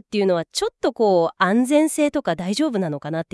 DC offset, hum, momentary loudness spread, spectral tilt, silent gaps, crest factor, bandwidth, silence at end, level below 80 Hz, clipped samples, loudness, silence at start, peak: under 0.1%; none; 8 LU; -5 dB/octave; none; 16 dB; 12 kHz; 0.1 s; -60 dBFS; under 0.1%; -20 LUFS; 0.1 s; -4 dBFS